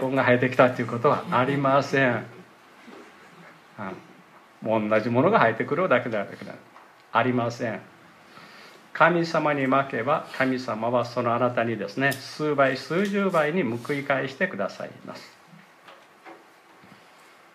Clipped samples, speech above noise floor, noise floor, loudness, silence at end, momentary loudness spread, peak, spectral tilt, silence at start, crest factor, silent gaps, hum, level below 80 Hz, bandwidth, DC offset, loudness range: under 0.1%; 29 dB; -53 dBFS; -24 LUFS; 1.2 s; 17 LU; -4 dBFS; -6.5 dB/octave; 0 s; 20 dB; none; none; -74 dBFS; 15.5 kHz; under 0.1%; 6 LU